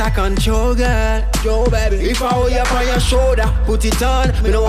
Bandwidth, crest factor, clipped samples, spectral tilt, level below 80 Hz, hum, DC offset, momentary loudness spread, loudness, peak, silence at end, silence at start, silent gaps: 14.5 kHz; 10 dB; under 0.1%; -5 dB/octave; -16 dBFS; none; under 0.1%; 3 LU; -16 LUFS; -4 dBFS; 0 s; 0 s; none